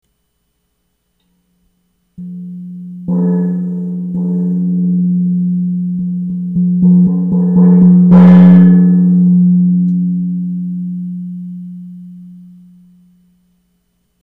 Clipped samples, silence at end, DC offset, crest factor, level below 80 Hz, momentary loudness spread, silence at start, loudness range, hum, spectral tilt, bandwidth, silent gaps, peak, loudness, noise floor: under 0.1%; 1.85 s; under 0.1%; 12 dB; -46 dBFS; 22 LU; 2.2 s; 17 LU; 60 Hz at -20 dBFS; -12 dB/octave; 2.4 kHz; none; 0 dBFS; -11 LUFS; -65 dBFS